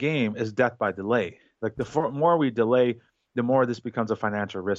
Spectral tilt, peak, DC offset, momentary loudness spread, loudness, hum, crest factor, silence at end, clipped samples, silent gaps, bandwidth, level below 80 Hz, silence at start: -7 dB/octave; -8 dBFS; under 0.1%; 11 LU; -25 LUFS; none; 16 dB; 0 s; under 0.1%; none; 7.8 kHz; -64 dBFS; 0 s